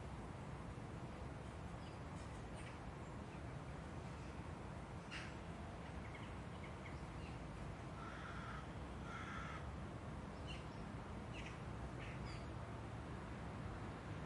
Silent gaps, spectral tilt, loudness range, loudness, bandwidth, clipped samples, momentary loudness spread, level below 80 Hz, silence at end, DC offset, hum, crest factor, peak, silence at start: none; -6 dB/octave; 1 LU; -51 LUFS; 11.5 kHz; under 0.1%; 2 LU; -58 dBFS; 0 s; under 0.1%; none; 14 dB; -36 dBFS; 0 s